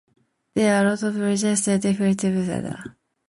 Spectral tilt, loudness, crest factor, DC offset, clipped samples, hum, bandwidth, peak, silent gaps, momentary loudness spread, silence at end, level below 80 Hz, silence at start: -5 dB/octave; -22 LUFS; 14 dB; under 0.1%; under 0.1%; none; 11.5 kHz; -8 dBFS; none; 12 LU; 0.4 s; -58 dBFS; 0.55 s